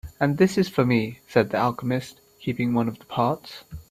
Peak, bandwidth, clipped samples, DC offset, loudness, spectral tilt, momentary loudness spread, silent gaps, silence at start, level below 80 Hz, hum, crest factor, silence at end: -4 dBFS; 15 kHz; under 0.1%; under 0.1%; -24 LUFS; -7 dB/octave; 13 LU; none; 0.05 s; -52 dBFS; none; 20 dB; 0.1 s